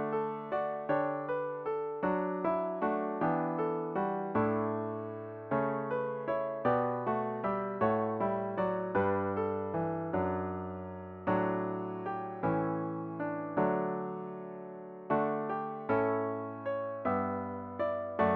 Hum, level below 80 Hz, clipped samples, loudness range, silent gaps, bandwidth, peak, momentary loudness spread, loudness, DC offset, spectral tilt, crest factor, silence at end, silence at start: none; -68 dBFS; under 0.1%; 2 LU; none; 5 kHz; -16 dBFS; 7 LU; -34 LUFS; under 0.1%; -7 dB/octave; 16 dB; 0 s; 0 s